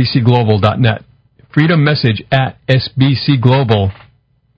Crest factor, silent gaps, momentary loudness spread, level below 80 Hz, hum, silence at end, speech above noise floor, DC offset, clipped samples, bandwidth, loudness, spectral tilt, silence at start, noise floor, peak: 12 dB; none; 4 LU; -38 dBFS; none; 0.65 s; 42 dB; under 0.1%; 0.2%; 5.4 kHz; -13 LUFS; -9 dB/octave; 0 s; -54 dBFS; 0 dBFS